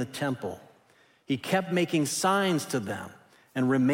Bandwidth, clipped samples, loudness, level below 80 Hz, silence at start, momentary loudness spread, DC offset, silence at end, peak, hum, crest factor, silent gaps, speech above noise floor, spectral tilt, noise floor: 16.5 kHz; under 0.1%; -28 LUFS; -72 dBFS; 0 s; 13 LU; under 0.1%; 0 s; -12 dBFS; none; 16 dB; none; 35 dB; -5 dB/octave; -62 dBFS